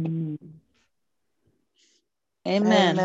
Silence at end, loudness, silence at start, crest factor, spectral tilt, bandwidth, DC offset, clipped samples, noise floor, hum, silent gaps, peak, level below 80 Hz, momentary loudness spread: 0 s; -24 LUFS; 0 s; 22 dB; -6 dB/octave; 8 kHz; under 0.1%; under 0.1%; -82 dBFS; none; none; -4 dBFS; -72 dBFS; 17 LU